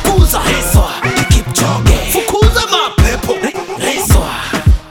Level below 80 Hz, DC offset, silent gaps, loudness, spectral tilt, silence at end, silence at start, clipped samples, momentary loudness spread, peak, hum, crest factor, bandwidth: -16 dBFS; under 0.1%; none; -12 LUFS; -4.5 dB/octave; 0 s; 0 s; 0.2%; 6 LU; 0 dBFS; none; 12 dB; 19 kHz